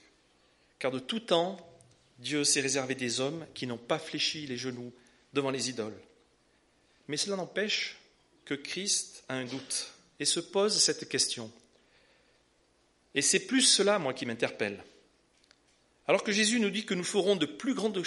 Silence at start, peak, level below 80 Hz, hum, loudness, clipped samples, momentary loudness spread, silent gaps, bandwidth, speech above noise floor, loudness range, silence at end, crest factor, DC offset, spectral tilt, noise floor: 0.8 s; -12 dBFS; -76 dBFS; none; -30 LUFS; under 0.1%; 13 LU; none; 11.5 kHz; 38 dB; 6 LU; 0 s; 22 dB; under 0.1%; -2 dB/octave; -69 dBFS